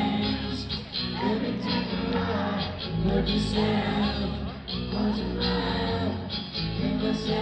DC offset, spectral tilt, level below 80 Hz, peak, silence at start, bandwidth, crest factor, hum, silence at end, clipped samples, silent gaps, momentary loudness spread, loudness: under 0.1%; -6.5 dB/octave; -40 dBFS; -12 dBFS; 0 s; 9 kHz; 16 dB; none; 0 s; under 0.1%; none; 6 LU; -28 LUFS